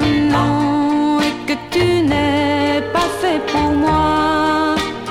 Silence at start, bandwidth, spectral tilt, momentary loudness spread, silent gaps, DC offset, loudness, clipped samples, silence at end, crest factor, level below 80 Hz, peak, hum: 0 s; 14.5 kHz; -5.5 dB/octave; 4 LU; none; under 0.1%; -16 LUFS; under 0.1%; 0 s; 12 dB; -36 dBFS; -4 dBFS; none